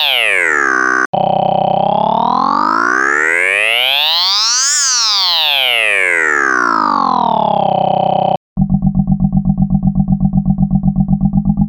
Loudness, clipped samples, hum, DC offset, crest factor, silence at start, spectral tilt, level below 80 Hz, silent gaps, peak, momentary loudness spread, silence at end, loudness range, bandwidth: -12 LUFS; under 0.1%; none; under 0.1%; 12 dB; 0 s; -3.5 dB/octave; -28 dBFS; 1.06-1.13 s, 8.37-8.56 s; 0 dBFS; 5 LU; 0 s; 4 LU; 19 kHz